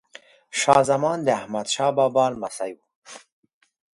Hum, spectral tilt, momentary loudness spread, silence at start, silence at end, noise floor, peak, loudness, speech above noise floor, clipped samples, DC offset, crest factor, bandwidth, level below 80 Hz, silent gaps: none; -3.5 dB/octave; 15 LU; 0.55 s; 0.75 s; -50 dBFS; 0 dBFS; -22 LUFS; 28 dB; under 0.1%; under 0.1%; 22 dB; 11.5 kHz; -64 dBFS; 2.95-3.02 s